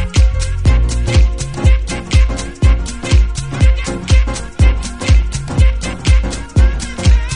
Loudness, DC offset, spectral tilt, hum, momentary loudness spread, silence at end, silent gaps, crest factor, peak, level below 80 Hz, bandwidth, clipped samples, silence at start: -15 LUFS; under 0.1%; -5.5 dB/octave; none; 4 LU; 0 s; none; 12 dB; 0 dBFS; -14 dBFS; 10.5 kHz; under 0.1%; 0 s